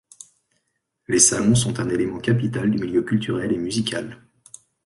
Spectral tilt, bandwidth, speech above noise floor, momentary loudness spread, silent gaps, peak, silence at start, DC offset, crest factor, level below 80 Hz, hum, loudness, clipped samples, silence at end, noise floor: -4 dB/octave; 11.5 kHz; 53 dB; 9 LU; none; -2 dBFS; 1.1 s; under 0.1%; 20 dB; -50 dBFS; none; -21 LUFS; under 0.1%; 0.7 s; -74 dBFS